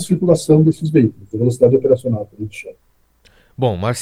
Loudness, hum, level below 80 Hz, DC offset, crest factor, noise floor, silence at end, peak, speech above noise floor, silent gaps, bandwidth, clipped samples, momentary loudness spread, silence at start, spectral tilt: -15 LUFS; none; -50 dBFS; under 0.1%; 16 dB; -54 dBFS; 0 s; 0 dBFS; 38 dB; none; 15 kHz; under 0.1%; 17 LU; 0 s; -7.5 dB/octave